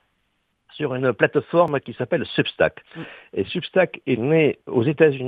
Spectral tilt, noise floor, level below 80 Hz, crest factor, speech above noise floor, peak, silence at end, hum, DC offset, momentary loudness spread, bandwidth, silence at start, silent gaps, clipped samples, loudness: -9 dB/octave; -70 dBFS; -60 dBFS; 20 dB; 50 dB; -2 dBFS; 0 s; none; under 0.1%; 11 LU; 4.9 kHz; 0.75 s; none; under 0.1%; -21 LUFS